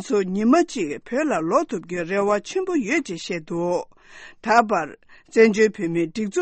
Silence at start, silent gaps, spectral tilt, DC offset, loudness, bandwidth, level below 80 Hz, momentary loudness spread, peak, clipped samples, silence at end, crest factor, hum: 0 s; none; -5.5 dB/octave; under 0.1%; -22 LUFS; 8.8 kHz; -60 dBFS; 10 LU; -2 dBFS; under 0.1%; 0 s; 20 dB; none